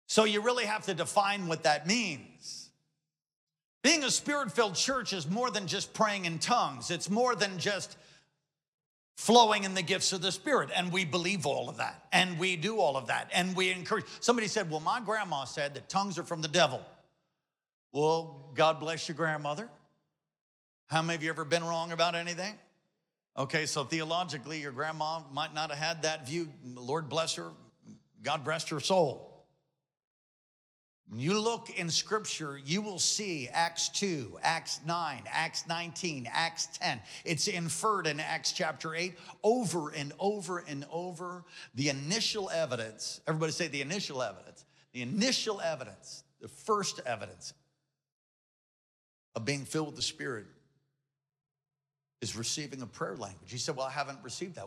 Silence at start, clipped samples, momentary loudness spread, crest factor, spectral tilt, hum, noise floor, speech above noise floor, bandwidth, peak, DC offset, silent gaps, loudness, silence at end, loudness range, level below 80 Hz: 0.1 s; under 0.1%; 12 LU; 24 dB; -3 dB/octave; none; under -90 dBFS; over 58 dB; 15 kHz; -10 dBFS; under 0.1%; 3.36-3.47 s, 3.64-3.81 s, 8.68-8.78 s, 8.86-9.15 s, 17.73-17.90 s, 20.41-20.87 s, 30.07-31.04 s, 48.12-49.32 s; -32 LUFS; 0 s; 9 LU; -78 dBFS